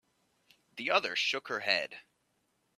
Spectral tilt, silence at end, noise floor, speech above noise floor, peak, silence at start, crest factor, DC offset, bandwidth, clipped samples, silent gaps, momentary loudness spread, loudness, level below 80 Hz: -1.5 dB/octave; 0.75 s; -77 dBFS; 44 dB; -12 dBFS; 0.75 s; 24 dB; under 0.1%; 14.5 kHz; under 0.1%; none; 17 LU; -31 LUFS; -84 dBFS